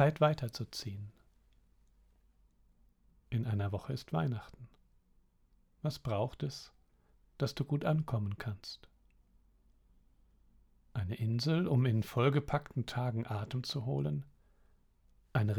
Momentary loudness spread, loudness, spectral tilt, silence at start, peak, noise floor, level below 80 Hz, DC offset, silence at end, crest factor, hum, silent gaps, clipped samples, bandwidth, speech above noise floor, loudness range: 14 LU; -36 LUFS; -7 dB/octave; 0 s; -16 dBFS; -69 dBFS; -62 dBFS; under 0.1%; 0 s; 22 dB; none; none; under 0.1%; 17.5 kHz; 35 dB; 9 LU